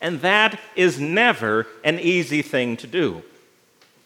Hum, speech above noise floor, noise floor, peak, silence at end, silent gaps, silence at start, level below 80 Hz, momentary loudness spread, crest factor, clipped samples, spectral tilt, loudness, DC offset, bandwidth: none; 37 dB; -57 dBFS; -2 dBFS; 0.85 s; none; 0 s; -72 dBFS; 7 LU; 20 dB; under 0.1%; -4.5 dB/octave; -20 LUFS; under 0.1%; 15.5 kHz